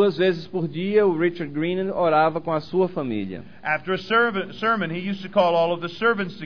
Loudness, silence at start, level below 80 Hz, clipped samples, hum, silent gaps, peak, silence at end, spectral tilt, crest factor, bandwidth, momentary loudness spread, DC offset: -23 LUFS; 0 s; -60 dBFS; under 0.1%; none; none; -6 dBFS; 0 s; -7.5 dB/octave; 16 dB; 5.4 kHz; 8 LU; 0.6%